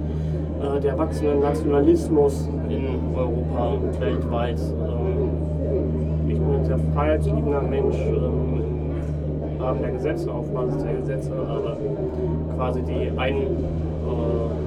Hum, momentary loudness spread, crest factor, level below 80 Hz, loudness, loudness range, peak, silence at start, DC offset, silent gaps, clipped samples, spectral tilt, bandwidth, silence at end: none; 6 LU; 16 dB; -30 dBFS; -24 LUFS; 4 LU; -6 dBFS; 0 s; under 0.1%; none; under 0.1%; -9 dB/octave; 10.5 kHz; 0 s